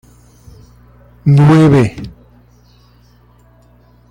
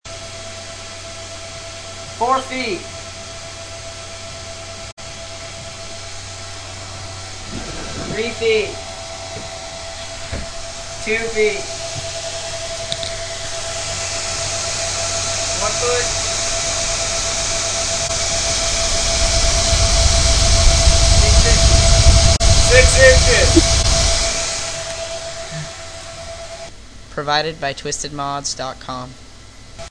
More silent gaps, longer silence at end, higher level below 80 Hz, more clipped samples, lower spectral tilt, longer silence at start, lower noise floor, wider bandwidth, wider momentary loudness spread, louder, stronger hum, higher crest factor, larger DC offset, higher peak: second, none vs 4.92-4.97 s; first, 2 s vs 0 s; second, -42 dBFS vs -22 dBFS; neither; first, -8.5 dB/octave vs -2.5 dB/octave; first, 1.25 s vs 0.05 s; first, -47 dBFS vs -39 dBFS; about the same, 10 kHz vs 10.5 kHz; first, 22 LU vs 18 LU; first, -10 LUFS vs -16 LUFS; first, 60 Hz at -40 dBFS vs none; about the same, 14 dB vs 18 dB; neither; about the same, -2 dBFS vs 0 dBFS